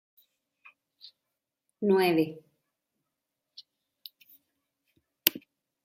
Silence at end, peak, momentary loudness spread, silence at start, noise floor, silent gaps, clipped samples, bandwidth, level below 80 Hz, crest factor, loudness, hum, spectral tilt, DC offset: 0.45 s; 0 dBFS; 26 LU; 1.8 s; -86 dBFS; none; under 0.1%; 16 kHz; -80 dBFS; 34 dB; -27 LUFS; none; -4.5 dB/octave; under 0.1%